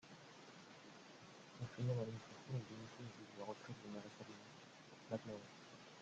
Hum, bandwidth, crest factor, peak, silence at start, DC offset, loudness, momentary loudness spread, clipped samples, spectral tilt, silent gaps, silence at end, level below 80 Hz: none; 8.8 kHz; 20 dB; -30 dBFS; 0 s; under 0.1%; -52 LUFS; 15 LU; under 0.1%; -6 dB/octave; none; 0 s; -82 dBFS